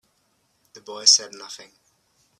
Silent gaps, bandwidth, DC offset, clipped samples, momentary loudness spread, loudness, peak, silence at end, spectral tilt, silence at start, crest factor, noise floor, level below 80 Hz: none; 14 kHz; under 0.1%; under 0.1%; 24 LU; -16 LUFS; -2 dBFS; 0.85 s; 2.5 dB/octave; 0.9 s; 26 dB; -68 dBFS; -82 dBFS